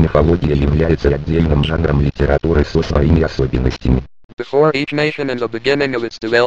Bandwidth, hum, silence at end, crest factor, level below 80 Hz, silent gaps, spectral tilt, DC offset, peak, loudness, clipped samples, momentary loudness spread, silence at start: 7.8 kHz; none; 0 s; 14 dB; -24 dBFS; 4.24-4.37 s; -7.5 dB/octave; 0.9%; 0 dBFS; -16 LUFS; under 0.1%; 6 LU; 0 s